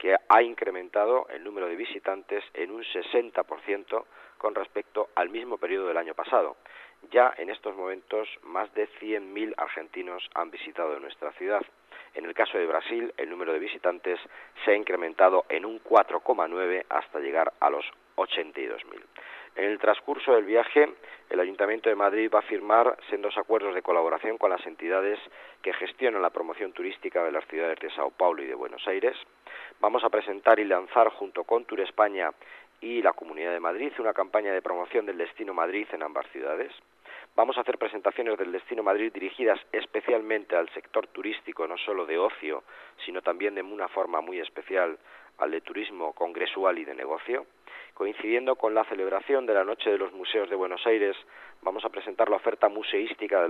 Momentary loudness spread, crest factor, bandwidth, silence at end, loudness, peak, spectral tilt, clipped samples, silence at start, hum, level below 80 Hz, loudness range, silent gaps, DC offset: 12 LU; 22 dB; 4.8 kHz; 0 s; -28 LUFS; -6 dBFS; -4.5 dB/octave; under 0.1%; 0 s; none; -80 dBFS; 6 LU; none; under 0.1%